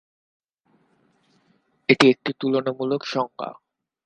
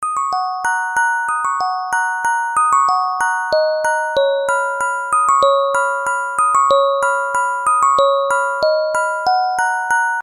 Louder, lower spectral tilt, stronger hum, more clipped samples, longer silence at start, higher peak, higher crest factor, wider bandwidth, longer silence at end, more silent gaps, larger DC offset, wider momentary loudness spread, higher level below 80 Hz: second, -21 LUFS vs -16 LUFS; first, -5.5 dB/octave vs 0 dB/octave; neither; neither; first, 1.9 s vs 0 s; about the same, 0 dBFS vs -2 dBFS; first, 24 dB vs 14 dB; second, 10 kHz vs 14 kHz; first, 0.5 s vs 0 s; neither; neither; first, 15 LU vs 6 LU; second, -70 dBFS vs -58 dBFS